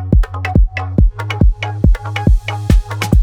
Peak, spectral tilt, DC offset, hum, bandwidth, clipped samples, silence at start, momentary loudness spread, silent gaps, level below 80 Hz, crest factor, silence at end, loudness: 0 dBFS; -7 dB/octave; 0.2%; none; 12.5 kHz; under 0.1%; 0 s; 1 LU; none; -14 dBFS; 12 dB; 0 s; -16 LUFS